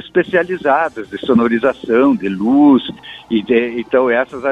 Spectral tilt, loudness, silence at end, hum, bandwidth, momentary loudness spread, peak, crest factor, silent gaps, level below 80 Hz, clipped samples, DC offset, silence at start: -7.5 dB/octave; -15 LUFS; 0 s; none; 6.4 kHz; 9 LU; 0 dBFS; 14 dB; none; -52 dBFS; under 0.1%; under 0.1%; 0.05 s